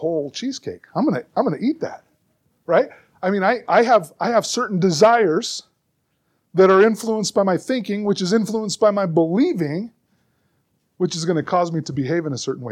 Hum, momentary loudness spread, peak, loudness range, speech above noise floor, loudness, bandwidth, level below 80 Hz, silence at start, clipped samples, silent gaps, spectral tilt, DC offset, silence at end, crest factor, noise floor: none; 13 LU; -2 dBFS; 5 LU; 51 dB; -19 LUFS; 15 kHz; -68 dBFS; 0 s; under 0.1%; none; -5 dB/octave; under 0.1%; 0 s; 18 dB; -70 dBFS